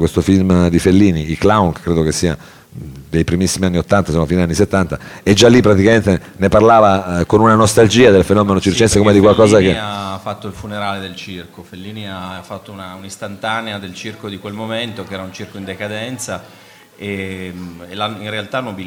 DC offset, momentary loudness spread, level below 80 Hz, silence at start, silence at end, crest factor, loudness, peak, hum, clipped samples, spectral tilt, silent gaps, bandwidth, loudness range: under 0.1%; 20 LU; -36 dBFS; 0 s; 0 s; 14 dB; -13 LUFS; 0 dBFS; none; under 0.1%; -5.5 dB/octave; none; 16.5 kHz; 15 LU